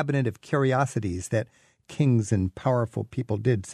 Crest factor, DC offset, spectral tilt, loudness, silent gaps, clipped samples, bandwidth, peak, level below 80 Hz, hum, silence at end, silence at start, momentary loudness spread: 16 dB; under 0.1%; -7 dB/octave; -26 LUFS; none; under 0.1%; 12 kHz; -10 dBFS; -56 dBFS; none; 0 s; 0 s; 7 LU